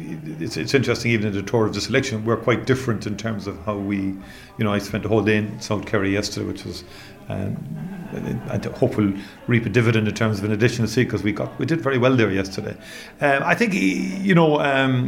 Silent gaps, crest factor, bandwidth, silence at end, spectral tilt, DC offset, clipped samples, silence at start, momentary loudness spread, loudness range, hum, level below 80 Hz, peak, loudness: none; 18 dB; 16 kHz; 0 s; -6 dB/octave; under 0.1%; under 0.1%; 0 s; 13 LU; 6 LU; none; -50 dBFS; -4 dBFS; -22 LUFS